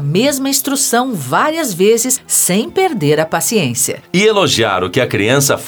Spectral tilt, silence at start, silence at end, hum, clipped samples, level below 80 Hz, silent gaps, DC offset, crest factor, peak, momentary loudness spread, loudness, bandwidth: -3.5 dB/octave; 0 s; 0 s; none; under 0.1%; -52 dBFS; none; under 0.1%; 14 dB; 0 dBFS; 4 LU; -13 LUFS; over 20 kHz